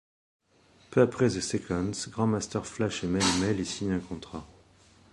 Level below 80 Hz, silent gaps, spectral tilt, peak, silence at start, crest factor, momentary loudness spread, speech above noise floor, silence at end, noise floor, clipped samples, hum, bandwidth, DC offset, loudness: -52 dBFS; none; -5 dB/octave; -8 dBFS; 0.9 s; 22 dB; 11 LU; 33 dB; 0.65 s; -61 dBFS; under 0.1%; none; 11.5 kHz; under 0.1%; -29 LUFS